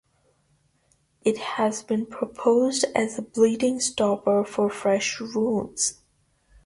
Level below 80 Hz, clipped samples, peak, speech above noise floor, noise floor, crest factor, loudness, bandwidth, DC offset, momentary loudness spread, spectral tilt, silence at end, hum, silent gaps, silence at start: -62 dBFS; under 0.1%; -8 dBFS; 43 dB; -66 dBFS; 18 dB; -24 LUFS; 11.5 kHz; under 0.1%; 6 LU; -3.5 dB/octave; 0.7 s; none; none; 1.25 s